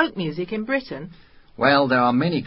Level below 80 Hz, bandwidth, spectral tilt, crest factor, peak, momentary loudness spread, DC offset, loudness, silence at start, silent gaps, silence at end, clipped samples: -56 dBFS; 5.8 kHz; -10.5 dB/octave; 18 dB; -4 dBFS; 18 LU; under 0.1%; -21 LUFS; 0 s; none; 0 s; under 0.1%